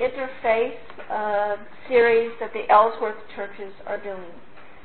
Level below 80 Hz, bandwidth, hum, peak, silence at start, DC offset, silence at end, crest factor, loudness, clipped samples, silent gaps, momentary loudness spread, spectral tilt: -60 dBFS; 4.4 kHz; none; -4 dBFS; 0 s; 1%; 0 s; 20 dB; -22 LUFS; under 0.1%; none; 17 LU; -8.5 dB/octave